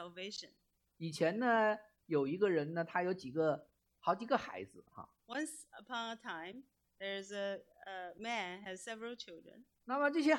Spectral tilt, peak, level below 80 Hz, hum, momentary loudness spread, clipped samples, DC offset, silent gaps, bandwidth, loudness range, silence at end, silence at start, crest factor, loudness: -5 dB/octave; -18 dBFS; -82 dBFS; none; 18 LU; under 0.1%; under 0.1%; none; 13 kHz; 8 LU; 0 s; 0 s; 20 dB; -39 LUFS